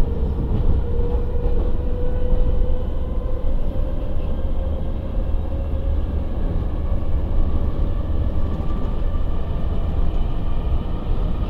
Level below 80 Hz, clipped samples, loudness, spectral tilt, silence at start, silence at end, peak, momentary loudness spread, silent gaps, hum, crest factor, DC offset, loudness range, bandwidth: -20 dBFS; under 0.1%; -25 LUFS; -10 dB/octave; 0 s; 0 s; -6 dBFS; 4 LU; none; none; 14 dB; 0.3%; 2 LU; 4 kHz